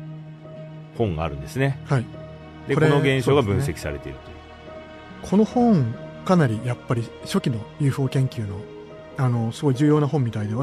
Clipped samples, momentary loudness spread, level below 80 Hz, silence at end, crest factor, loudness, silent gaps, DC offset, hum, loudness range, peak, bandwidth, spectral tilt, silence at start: under 0.1%; 21 LU; -46 dBFS; 0 s; 18 dB; -22 LUFS; none; under 0.1%; none; 2 LU; -6 dBFS; 13.5 kHz; -7.5 dB/octave; 0 s